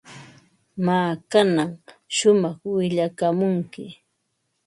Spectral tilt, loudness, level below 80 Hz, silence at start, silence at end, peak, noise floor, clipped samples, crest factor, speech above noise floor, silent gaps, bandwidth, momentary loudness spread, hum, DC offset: -5.5 dB/octave; -22 LUFS; -68 dBFS; 0.1 s; 0.75 s; -4 dBFS; -74 dBFS; under 0.1%; 18 dB; 53 dB; none; 11.5 kHz; 15 LU; none; under 0.1%